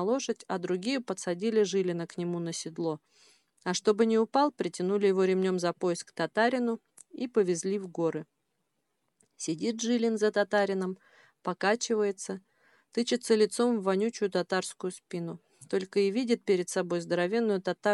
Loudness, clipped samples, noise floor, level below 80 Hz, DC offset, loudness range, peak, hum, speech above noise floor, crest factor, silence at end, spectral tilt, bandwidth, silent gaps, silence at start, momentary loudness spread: -30 LUFS; under 0.1%; -80 dBFS; -86 dBFS; under 0.1%; 4 LU; -12 dBFS; none; 51 dB; 18 dB; 0 s; -4.5 dB/octave; 12 kHz; none; 0 s; 12 LU